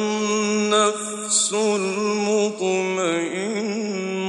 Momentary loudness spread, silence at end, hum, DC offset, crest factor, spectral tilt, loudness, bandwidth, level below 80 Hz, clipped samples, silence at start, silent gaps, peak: 7 LU; 0 s; none; under 0.1%; 16 dB; -3 dB/octave; -21 LUFS; 11.5 kHz; -74 dBFS; under 0.1%; 0 s; none; -6 dBFS